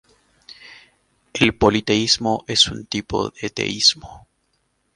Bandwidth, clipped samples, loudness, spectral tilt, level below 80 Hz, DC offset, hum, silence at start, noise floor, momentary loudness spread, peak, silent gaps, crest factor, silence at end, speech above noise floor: 11.5 kHz; under 0.1%; -18 LUFS; -3 dB/octave; -44 dBFS; under 0.1%; none; 0.5 s; -68 dBFS; 12 LU; 0 dBFS; none; 22 dB; 0.8 s; 48 dB